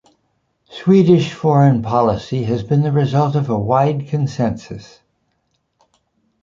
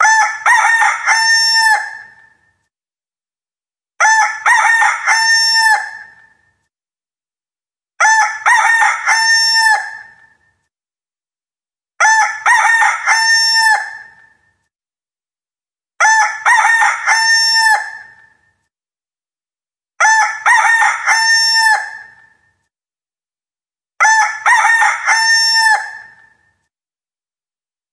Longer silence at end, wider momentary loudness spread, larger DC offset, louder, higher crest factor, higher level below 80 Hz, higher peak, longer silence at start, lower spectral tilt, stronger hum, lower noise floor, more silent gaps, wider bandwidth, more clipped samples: second, 1.6 s vs 1.9 s; first, 9 LU vs 5 LU; neither; second, -16 LUFS vs -10 LUFS; about the same, 16 dB vs 14 dB; first, -48 dBFS vs -72 dBFS; about the same, -2 dBFS vs 0 dBFS; first, 0.7 s vs 0 s; first, -8.5 dB/octave vs 5 dB/octave; neither; second, -67 dBFS vs under -90 dBFS; neither; second, 7.4 kHz vs 11 kHz; neither